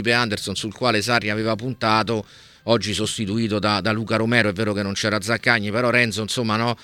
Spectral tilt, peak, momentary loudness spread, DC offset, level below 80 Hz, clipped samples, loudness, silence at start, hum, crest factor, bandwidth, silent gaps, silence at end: -4.5 dB/octave; -2 dBFS; 5 LU; under 0.1%; -58 dBFS; under 0.1%; -21 LUFS; 0 s; none; 20 dB; 16.5 kHz; none; 0 s